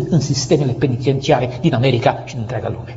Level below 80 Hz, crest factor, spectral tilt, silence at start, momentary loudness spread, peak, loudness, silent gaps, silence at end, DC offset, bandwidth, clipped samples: -44 dBFS; 16 dB; -6 dB/octave; 0 s; 9 LU; 0 dBFS; -17 LUFS; none; 0 s; under 0.1%; 8 kHz; under 0.1%